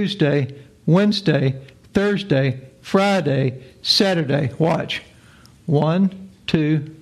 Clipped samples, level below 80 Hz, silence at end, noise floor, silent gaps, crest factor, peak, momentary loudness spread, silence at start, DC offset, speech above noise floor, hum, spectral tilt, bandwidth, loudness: under 0.1%; -54 dBFS; 0.05 s; -48 dBFS; none; 16 dB; -4 dBFS; 12 LU; 0 s; under 0.1%; 29 dB; none; -6.5 dB/octave; 13 kHz; -19 LUFS